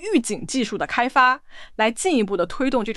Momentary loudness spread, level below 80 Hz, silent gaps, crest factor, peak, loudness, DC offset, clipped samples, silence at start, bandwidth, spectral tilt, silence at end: 8 LU; -46 dBFS; none; 16 dB; -4 dBFS; -21 LUFS; under 0.1%; under 0.1%; 0 s; 12.5 kHz; -3.5 dB/octave; 0 s